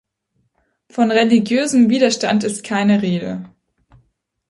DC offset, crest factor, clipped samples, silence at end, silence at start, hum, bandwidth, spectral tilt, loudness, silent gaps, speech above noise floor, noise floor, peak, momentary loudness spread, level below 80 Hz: under 0.1%; 16 dB; under 0.1%; 1 s; 0.95 s; none; 11.5 kHz; -5 dB/octave; -16 LUFS; none; 52 dB; -68 dBFS; -2 dBFS; 11 LU; -60 dBFS